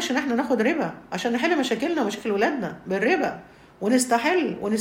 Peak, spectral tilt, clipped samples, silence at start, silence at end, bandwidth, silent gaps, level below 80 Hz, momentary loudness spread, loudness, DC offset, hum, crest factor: -8 dBFS; -4 dB/octave; under 0.1%; 0 s; 0 s; 16 kHz; none; -62 dBFS; 8 LU; -24 LUFS; under 0.1%; none; 16 dB